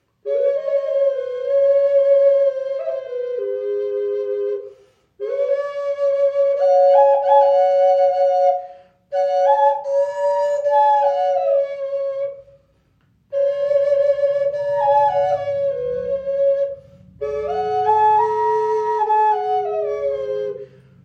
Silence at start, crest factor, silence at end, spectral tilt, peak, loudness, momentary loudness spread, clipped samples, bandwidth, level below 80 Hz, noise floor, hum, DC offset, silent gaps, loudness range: 0.25 s; 16 dB; 0.4 s; -5 dB/octave; -4 dBFS; -18 LUFS; 11 LU; under 0.1%; 7 kHz; -60 dBFS; -60 dBFS; none; under 0.1%; none; 5 LU